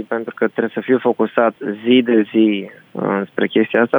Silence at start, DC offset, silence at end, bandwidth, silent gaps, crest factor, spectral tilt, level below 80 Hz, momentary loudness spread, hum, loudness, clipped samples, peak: 0 s; under 0.1%; 0 s; over 20 kHz; none; 14 dB; -8.5 dB/octave; -70 dBFS; 10 LU; none; -17 LUFS; under 0.1%; -2 dBFS